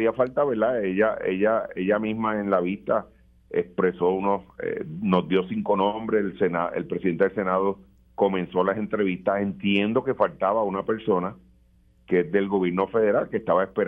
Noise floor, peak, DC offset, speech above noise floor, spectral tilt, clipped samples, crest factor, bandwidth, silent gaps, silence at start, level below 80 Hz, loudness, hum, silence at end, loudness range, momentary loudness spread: -58 dBFS; -6 dBFS; under 0.1%; 35 dB; -9.5 dB/octave; under 0.1%; 18 dB; 4.4 kHz; none; 0 s; -58 dBFS; -25 LUFS; none; 0 s; 1 LU; 5 LU